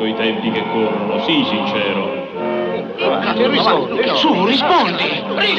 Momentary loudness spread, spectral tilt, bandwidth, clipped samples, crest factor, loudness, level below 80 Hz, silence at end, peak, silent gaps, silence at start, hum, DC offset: 7 LU; -6 dB/octave; 7.8 kHz; under 0.1%; 14 dB; -16 LUFS; -58 dBFS; 0 s; -2 dBFS; none; 0 s; none; under 0.1%